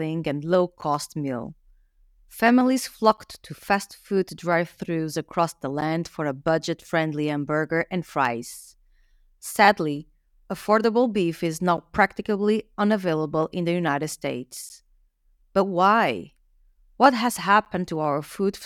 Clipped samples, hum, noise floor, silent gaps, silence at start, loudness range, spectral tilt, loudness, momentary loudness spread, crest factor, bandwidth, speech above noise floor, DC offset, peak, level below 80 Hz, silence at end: under 0.1%; none; -63 dBFS; none; 0 s; 4 LU; -5.5 dB/octave; -24 LUFS; 14 LU; 22 dB; 18 kHz; 39 dB; under 0.1%; -2 dBFS; -58 dBFS; 0 s